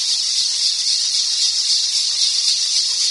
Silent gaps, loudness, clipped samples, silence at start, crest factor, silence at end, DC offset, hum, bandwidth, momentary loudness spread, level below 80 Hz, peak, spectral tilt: none; -15 LUFS; under 0.1%; 0 s; 16 dB; 0 s; under 0.1%; 50 Hz at -60 dBFS; 11.5 kHz; 1 LU; -68 dBFS; -2 dBFS; 5.5 dB/octave